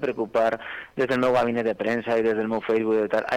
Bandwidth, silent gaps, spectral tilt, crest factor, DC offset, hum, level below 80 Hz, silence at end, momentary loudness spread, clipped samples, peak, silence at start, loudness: 11.5 kHz; none; -6.5 dB/octave; 10 dB; under 0.1%; none; -60 dBFS; 0 s; 5 LU; under 0.1%; -14 dBFS; 0 s; -24 LUFS